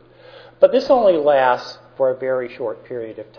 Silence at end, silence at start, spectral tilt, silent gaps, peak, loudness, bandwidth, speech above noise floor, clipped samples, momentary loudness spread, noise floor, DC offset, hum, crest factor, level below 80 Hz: 0.15 s; 0.6 s; -6 dB/octave; none; 0 dBFS; -17 LUFS; 5.4 kHz; 26 dB; under 0.1%; 16 LU; -44 dBFS; under 0.1%; none; 18 dB; -58 dBFS